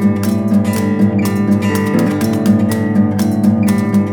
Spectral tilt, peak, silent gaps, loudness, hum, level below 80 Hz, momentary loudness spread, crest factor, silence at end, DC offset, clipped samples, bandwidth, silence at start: -7 dB/octave; 0 dBFS; none; -14 LUFS; none; -54 dBFS; 2 LU; 12 dB; 0 s; under 0.1%; under 0.1%; 19 kHz; 0 s